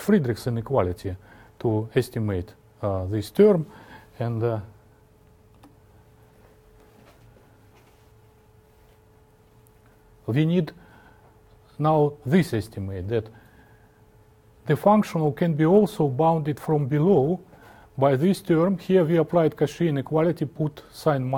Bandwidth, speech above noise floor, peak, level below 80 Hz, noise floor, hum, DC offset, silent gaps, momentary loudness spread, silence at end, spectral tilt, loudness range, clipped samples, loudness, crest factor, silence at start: 17.5 kHz; 34 dB; -4 dBFS; -56 dBFS; -56 dBFS; none; under 0.1%; none; 13 LU; 0 s; -8 dB/octave; 9 LU; under 0.1%; -23 LUFS; 20 dB; 0 s